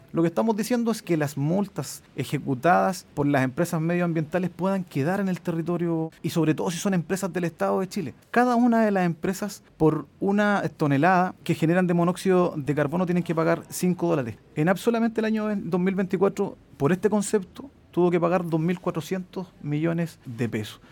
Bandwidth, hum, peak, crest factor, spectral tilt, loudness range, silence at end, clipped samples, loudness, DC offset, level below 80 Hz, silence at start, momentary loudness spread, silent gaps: 17.5 kHz; none; -8 dBFS; 18 dB; -6.5 dB/octave; 3 LU; 0.15 s; under 0.1%; -25 LUFS; under 0.1%; -60 dBFS; 0.15 s; 9 LU; none